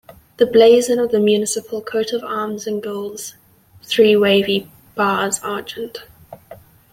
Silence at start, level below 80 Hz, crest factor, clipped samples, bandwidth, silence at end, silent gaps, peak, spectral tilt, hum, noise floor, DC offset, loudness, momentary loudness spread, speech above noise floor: 0.4 s; -60 dBFS; 16 dB; under 0.1%; 16.5 kHz; 0.35 s; none; -2 dBFS; -3.5 dB/octave; none; -46 dBFS; under 0.1%; -17 LUFS; 17 LU; 30 dB